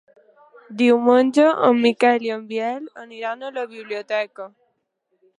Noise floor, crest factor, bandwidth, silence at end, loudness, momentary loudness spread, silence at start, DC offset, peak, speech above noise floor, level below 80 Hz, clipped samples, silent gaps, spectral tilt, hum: -72 dBFS; 18 dB; 11 kHz; 0.9 s; -19 LUFS; 17 LU; 0.7 s; under 0.1%; -2 dBFS; 52 dB; -76 dBFS; under 0.1%; none; -5 dB/octave; none